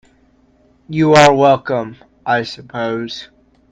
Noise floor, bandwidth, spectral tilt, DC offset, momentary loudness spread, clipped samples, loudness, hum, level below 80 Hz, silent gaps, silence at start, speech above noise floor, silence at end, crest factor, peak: -53 dBFS; 10 kHz; -5 dB/octave; under 0.1%; 19 LU; under 0.1%; -14 LUFS; none; -52 dBFS; none; 0.9 s; 40 dB; 0.45 s; 16 dB; 0 dBFS